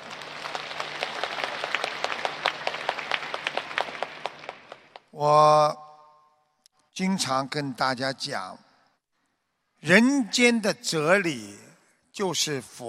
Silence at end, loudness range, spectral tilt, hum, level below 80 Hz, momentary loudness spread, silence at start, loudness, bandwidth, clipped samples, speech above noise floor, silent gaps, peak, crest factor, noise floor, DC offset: 0 s; 6 LU; -3.5 dB/octave; none; -72 dBFS; 18 LU; 0 s; -25 LUFS; 15.5 kHz; under 0.1%; 52 dB; none; -2 dBFS; 24 dB; -75 dBFS; under 0.1%